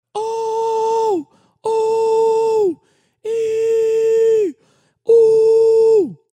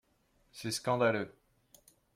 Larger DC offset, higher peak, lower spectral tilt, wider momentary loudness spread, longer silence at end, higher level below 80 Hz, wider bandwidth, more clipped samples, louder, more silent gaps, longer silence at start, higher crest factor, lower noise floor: neither; first, -4 dBFS vs -16 dBFS; about the same, -5 dB/octave vs -4.5 dB/octave; second, 12 LU vs 15 LU; second, 0.2 s vs 0.85 s; about the same, -70 dBFS vs -74 dBFS; second, 9.6 kHz vs 16 kHz; neither; first, -16 LUFS vs -33 LUFS; neither; second, 0.15 s vs 0.55 s; second, 12 dB vs 20 dB; second, -58 dBFS vs -72 dBFS